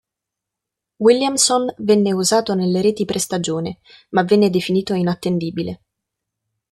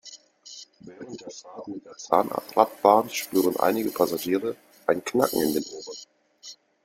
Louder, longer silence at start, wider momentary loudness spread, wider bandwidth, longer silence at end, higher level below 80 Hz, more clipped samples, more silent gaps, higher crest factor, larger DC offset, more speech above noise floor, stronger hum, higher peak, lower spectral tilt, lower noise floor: first, -18 LUFS vs -24 LUFS; first, 1 s vs 0.05 s; second, 10 LU vs 23 LU; second, 13 kHz vs 16.5 kHz; first, 0.95 s vs 0.3 s; first, -58 dBFS vs -68 dBFS; neither; neither; second, 18 dB vs 24 dB; neither; first, 66 dB vs 23 dB; neither; about the same, -2 dBFS vs -2 dBFS; about the same, -4.5 dB/octave vs -4 dB/octave; first, -84 dBFS vs -48 dBFS